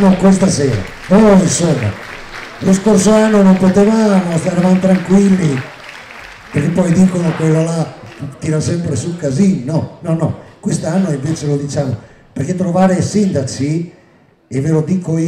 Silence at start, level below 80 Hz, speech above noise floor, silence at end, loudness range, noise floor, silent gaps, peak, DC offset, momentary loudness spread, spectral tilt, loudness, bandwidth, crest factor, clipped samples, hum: 0 s; -40 dBFS; 36 dB; 0 s; 6 LU; -48 dBFS; none; -2 dBFS; under 0.1%; 16 LU; -6.5 dB/octave; -13 LUFS; 11 kHz; 10 dB; under 0.1%; none